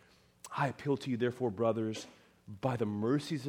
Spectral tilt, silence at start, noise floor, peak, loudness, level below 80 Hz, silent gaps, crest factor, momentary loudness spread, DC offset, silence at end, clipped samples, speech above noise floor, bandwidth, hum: -6.5 dB/octave; 0.45 s; -57 dBFS; -18 dBFS; -35 LUFS; -72 dBFS; none; 18 dB; 14 LU; under 0.1%; 0 s; under 0.1%; 23 dB; 16.5 kHz; none